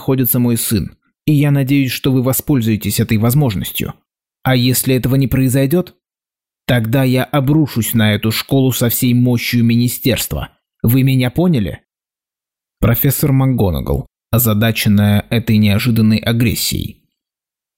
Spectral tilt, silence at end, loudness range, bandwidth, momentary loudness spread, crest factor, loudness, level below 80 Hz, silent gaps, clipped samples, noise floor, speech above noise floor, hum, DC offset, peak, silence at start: -5.5 dB/octave; 0.85 s; 2 LU; 16.5 kHz; 8 LU; 10 dB; -14 LUFS; -36 dBFS; none; under 0.1%; under -90 dBFS; over 77 dB; none; 0.2%; -4 dBFS; 0 s